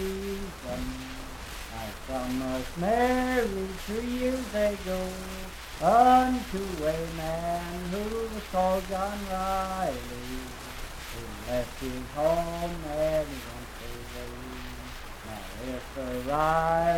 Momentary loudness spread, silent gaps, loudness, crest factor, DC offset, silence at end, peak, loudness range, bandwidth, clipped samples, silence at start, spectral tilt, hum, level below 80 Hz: 15 LU; none; -30 LUFS; 20 dB; under 0.1%; 0 s; -10 dBFS; 7 LU; 17.5 kHz; under 0.1%; 0 s; -5 dB/octave; none; -42 dBFS